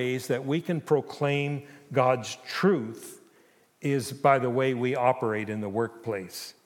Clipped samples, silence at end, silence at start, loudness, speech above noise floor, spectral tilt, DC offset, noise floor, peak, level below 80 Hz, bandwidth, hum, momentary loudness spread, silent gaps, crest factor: under 0.1%; 0.15 s; 0 s; -27 LUFS; 34 dB; -6 dB/octave; under 0.1%; -61 dBFS; -8 dBFS; -80 dBFS; 17.5 kHz; none; 11 LU; none; 20 dB